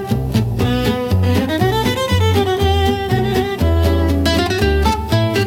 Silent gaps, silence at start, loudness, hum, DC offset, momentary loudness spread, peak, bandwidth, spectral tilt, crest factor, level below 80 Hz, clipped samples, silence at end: none; 0 s; -16 LUFS; none; under 0.1%; 2 LU; -2 dBFS; 17 kHz; -6 dB/octave; 12 dB; -26 dBFS; under 0.1%; 0 s